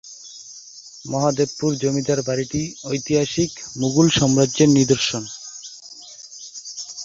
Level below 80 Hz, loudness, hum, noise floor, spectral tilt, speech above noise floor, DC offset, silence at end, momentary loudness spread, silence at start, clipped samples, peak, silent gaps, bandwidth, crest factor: -52 dBFS; -20 LUFS; none; -41 dBFS; -4.5 dB/octave; 22 dB; under 0.1%; 0 s; 21 LU; 0.05 s; under 0.1%; -2 dBFS; none; 7.8 kHz; 18 dB